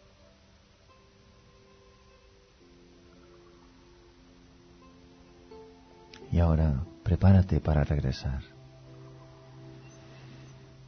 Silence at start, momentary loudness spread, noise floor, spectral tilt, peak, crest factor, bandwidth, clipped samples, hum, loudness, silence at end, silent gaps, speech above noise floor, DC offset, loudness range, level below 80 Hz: 5.5 s; 28 LU; -59 dBFS; -9 dB/octave; -10 dBFS; 20 dB; 6.4 kHz; under 0.1%; none; -27 LUFS; 0.45 s; none; 35 dB; under 0.1%; 7 LU; -40 dBFS